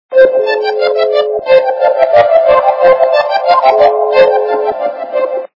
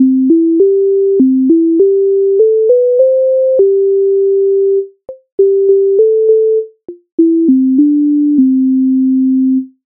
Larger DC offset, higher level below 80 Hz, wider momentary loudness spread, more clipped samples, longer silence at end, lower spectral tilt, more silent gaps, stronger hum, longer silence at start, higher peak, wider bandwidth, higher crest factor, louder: neither; first, -52 dBFS vs -66 dBFS; first, 8 LU vs 4 LU; first, 0.7% vs under 0.1%; about the same, 0.15 s vs 0.2 s; second, -5 dB/octave vs -13.5 dB/octave; second, none vs 5.32-5.38 s, 7.12-7.18 s; neither; about the same, 0.1 s vs 0 s; about the same, 0 dBFS vs 0 dBFS; first, 6 kHz vs 0.9 kHz; about the same, 10 dB vs 8 dB; about the same, -10 LUFS vs -10 LUFS